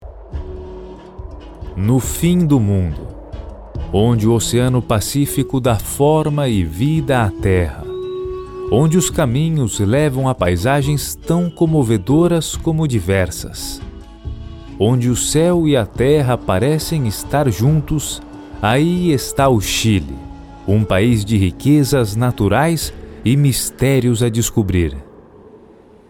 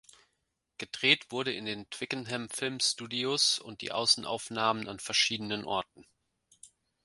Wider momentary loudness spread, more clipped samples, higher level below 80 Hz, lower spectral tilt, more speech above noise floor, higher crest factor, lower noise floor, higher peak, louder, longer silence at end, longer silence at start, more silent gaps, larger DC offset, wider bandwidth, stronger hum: first, 17 LU vs 11 LU; neither; first, -32 dBFS vs -72 dBFS; first, -6 dB/octave vs -2 dB/octave; second, 29 dB vs 49 dB; second, 16 dB vs 28 dB; second, -44 dBFS vs -81 dBFS; first, -2 dBFS vs -6 dBFS; first, -16 LUFS vs -30 LUFS; about the same, 0.5 s vs 0.4 s; second, 0 s vs 0.8 s; neither; neither; first, 18 kHz vs 11.5 kHz; neither